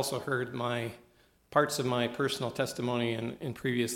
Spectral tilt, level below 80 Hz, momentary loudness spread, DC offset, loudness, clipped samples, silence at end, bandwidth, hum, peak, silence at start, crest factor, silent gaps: -4.5 dB/octave; -68 dBFS; 7 LU; under 0.1%; -32 LUFS; under 0.1%; 0 s; 18 kHz; none; -10 dBFS; 0 s; 22 dB; none